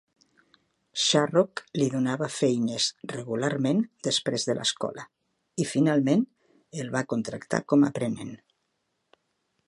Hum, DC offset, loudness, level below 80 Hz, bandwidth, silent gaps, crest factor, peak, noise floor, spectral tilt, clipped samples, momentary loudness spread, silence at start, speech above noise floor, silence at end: none; under 0.1%; -26 LUFS; -72 dBFS; 11.5 kHz; none; 22 dB; -6 dBFS; -77 dBFS; -4.5 dB/octave; under 0.1%; 14 LU; 0.95 s; 51 dB; 1.3 s